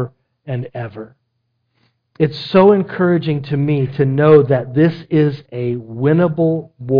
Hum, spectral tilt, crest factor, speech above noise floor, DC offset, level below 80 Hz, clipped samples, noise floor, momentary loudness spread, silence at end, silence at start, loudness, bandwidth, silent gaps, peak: none; -10.5 dB/octave; 16 dB; 54 dB; under 0.1%; -54 dBFS; under 0.1%; -69 dBFS; 15 LU; 0 s; 0 s; -15 LUFS; 5.2 kHz; none; 0 dBFS